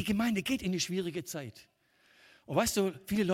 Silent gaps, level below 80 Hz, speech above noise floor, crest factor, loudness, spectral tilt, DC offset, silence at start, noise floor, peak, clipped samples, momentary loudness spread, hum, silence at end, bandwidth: none; -58 dBFS; 34 dB; 18 dB; -32 LUFS; -4.5 dB/octave; under 0.1%; 0 s; -66 dBFS; -14 dBFS; under 0.1%; 11 LU; none; 0 s; 16.5 kHz